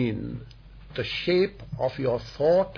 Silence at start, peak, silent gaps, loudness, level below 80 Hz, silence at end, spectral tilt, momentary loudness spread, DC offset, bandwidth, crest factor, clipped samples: 0 s; -12 dBFS; none; -27 LUFS; -48 dBFS; 0 s; -7.5 dB/octave; 14 LU; under 0.1%; 5.4 kHz; 14 dB; under 0.1%